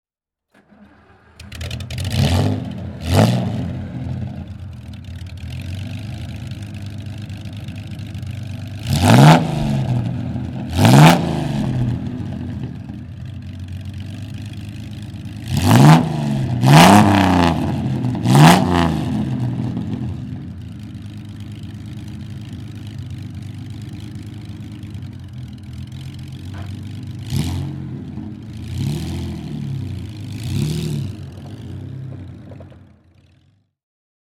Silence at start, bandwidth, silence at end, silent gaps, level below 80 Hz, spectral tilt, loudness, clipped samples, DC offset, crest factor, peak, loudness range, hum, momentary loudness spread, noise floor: 1.4 s; 18.5 kHz; 1.5 s; none; -40 dBFS; -6 dB/octave; -16 LUFS; under 0.1%; under 0.1%; 18 dB; 0 dBFS; 19 LU; none; 22 LU; -76 dBFS